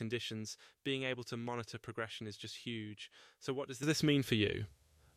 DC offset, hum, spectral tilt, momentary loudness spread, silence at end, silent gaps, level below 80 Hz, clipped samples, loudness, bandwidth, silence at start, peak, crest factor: under 0.1%; none; -5 dB/octave; 15 LU; 0.45 s; none; -68 dBFS; under 0.1%; -39 LUFS; 15 kHz; 0 s; -18 dBFS; 22 dB